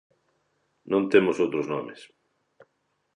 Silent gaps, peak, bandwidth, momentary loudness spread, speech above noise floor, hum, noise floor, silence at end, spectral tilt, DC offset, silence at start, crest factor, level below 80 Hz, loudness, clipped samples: none; -6 dBFS; 10.5 kHz; 12 LU; 50 dB; none; -74 dBFS; 1.1 s; -6.5 dB/octave; under 0.1%; 0.85 s; 22 dB; -70 dBFS; -24 LUFS; under 0.1%